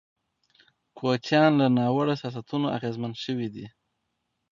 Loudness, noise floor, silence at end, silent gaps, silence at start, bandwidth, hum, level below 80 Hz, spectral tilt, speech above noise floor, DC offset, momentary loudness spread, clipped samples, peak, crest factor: -26 LUFS; -78 dBFS; 0.85 s; none; 0.95 s; 7.4 kHz; none; -68 dBFS; -7 dB/octave; 54 dB; under 0.1%; 12 LU; under 0.1%; -8 dBFS; 18 dB